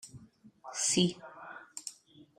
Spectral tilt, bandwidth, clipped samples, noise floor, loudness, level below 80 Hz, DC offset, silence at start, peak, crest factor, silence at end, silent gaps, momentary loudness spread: -3 dB/octave; 16 kHz; under 0.1%; -57 dBFS; -32 LUFS; -72 dBFS; under 0.1%; 0.05 s; -14 dBFS; 22 dB; 0.45 s; none; 22 LU